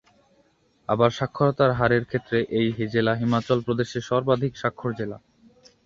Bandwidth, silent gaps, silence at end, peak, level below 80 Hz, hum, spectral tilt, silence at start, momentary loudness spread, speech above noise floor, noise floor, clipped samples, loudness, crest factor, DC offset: 7.6 kHz; none; 0.7 s; -4 dBFS; -54 dBFS; none; -7 dB/octave; 0.9 s; 9 LU; 40 dB; -63 dBFS; under 0.1%; -24 LUFS; 20 dB; under 0.1%